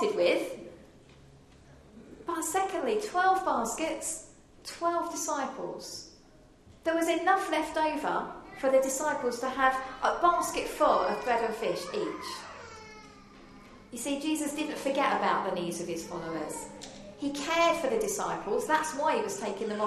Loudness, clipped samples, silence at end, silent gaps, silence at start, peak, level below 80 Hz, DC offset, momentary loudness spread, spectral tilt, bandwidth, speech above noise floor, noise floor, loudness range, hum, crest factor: -30 LUFS; under 0.1%; 0 s; none; 0 s; -10 dBFS; -60 dBFS; under 0.1%; 15 LU; -3 dB/octave; 13 kHz; 27 dB; -57 dBFS; 6 LU; none; 20 dB